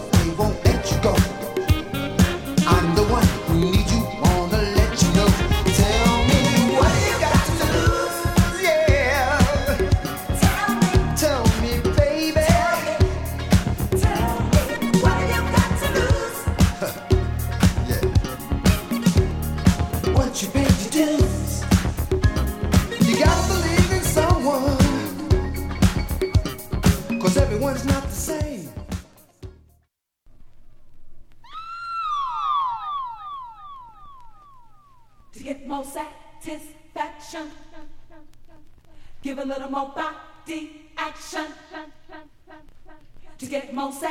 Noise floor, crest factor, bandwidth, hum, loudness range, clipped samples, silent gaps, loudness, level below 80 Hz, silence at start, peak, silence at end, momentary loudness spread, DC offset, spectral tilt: -67 dBFS; 20 dB; 17.5 kHz; none; 17 LU; under 0.1%; none; -21 LUFS; -28 dBFS; 0 s; -2 dBFS; 0 s; 16 LU; under 0.1%; -5.5 dB/octave